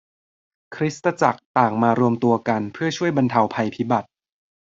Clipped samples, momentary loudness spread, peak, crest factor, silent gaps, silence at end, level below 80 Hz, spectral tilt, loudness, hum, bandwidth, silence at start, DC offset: under 0.1%; 7 LU; -2 dBFS; 20 dB; 1.45-1.55 s; 0.75 s; -62 dBFS; -6.5 dB/octave; -21 LUFS; none; 7.8 kHz; 0.7 s; under 0.1%